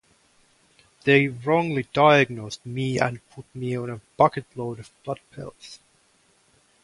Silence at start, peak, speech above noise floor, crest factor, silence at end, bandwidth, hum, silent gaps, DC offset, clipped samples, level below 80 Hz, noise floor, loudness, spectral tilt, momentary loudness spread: 1.05 s; -4 dBFS; 39 dB; 22 dB; 1.05 s; 11.5 kHz; none; none; under 0.1%; under 0.1%; -62 dBFS; -62 dBFS; -23 LUFS; -6 dB/octave; 21 LU